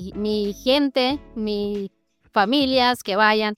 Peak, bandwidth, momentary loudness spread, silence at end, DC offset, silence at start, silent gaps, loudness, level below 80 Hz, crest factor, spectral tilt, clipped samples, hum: -4 dBFS; 16.5 kHz; 10 LU; 0 s; under 0.1%; 0 s; none; -21 LUFS; -50 dBFS; 18 dB; -4.5 dB/octave; under 0.1%; none